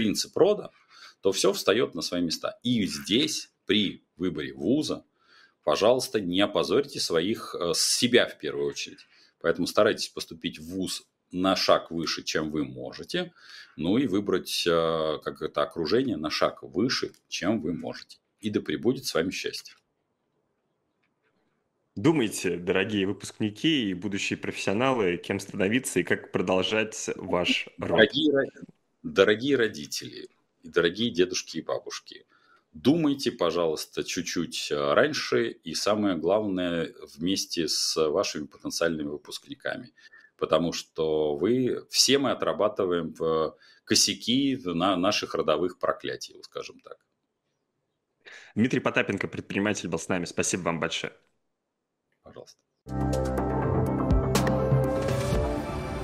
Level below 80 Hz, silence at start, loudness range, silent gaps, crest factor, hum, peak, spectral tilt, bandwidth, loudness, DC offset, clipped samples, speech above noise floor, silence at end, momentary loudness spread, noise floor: -46 dBFS; 0 s; 6 LU; none; 24 dB; none; -4 dBFS; -4 dB/octave; 16 kHz; -27 LUFS; under 0.1%; under 0.1%; 55 dB; 0 s; 11 LU; -82 dBFS